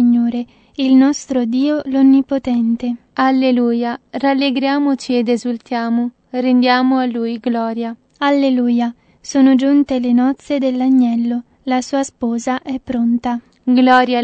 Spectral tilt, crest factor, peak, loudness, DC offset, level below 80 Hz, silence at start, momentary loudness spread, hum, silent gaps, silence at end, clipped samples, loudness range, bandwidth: -4.5 dB/octave; 14 dB; 0 dBFS; -16 LUFS; under 0.1%; -56 dBFS; 0 s; 10 LU; none; none; 0 s; under 0.1%; 2 LU; 8.6 kHz